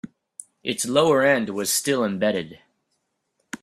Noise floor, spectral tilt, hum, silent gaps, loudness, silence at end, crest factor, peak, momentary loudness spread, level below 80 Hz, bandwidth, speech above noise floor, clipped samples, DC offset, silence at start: -75 dBFS; -3.5 dB/octave; none; none; -22 LUFS; 0.05 s; 20 dB; -4 dBFS; 22 LU; -66 dBFS; 15.5 kHz; 53 dB; under 0.1%; under 0.1%; 0.05 s